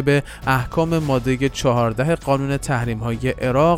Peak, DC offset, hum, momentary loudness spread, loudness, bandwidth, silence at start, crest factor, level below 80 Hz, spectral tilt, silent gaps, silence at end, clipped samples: -4 dBFS; under 0.1%; none; 4 LU; -20 LUFS; 16.5 kHz; 0 s; 16 dB; -36 dBFS; -6.5 dB/octave; none; 0 s; under 0.1%